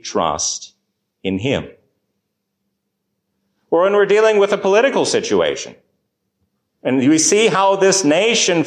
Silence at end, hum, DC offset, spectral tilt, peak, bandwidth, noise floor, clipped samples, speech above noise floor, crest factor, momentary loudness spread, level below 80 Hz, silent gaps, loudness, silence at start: 0 s; none; under 0.1%; -3 dB/octave; -2 dBFS; 15 kHz; -74 dBFS; under 0.1%; 59 dB; 14 dB; 11 LU; -52 dBFS; none; -15 LUFS; 0.05 s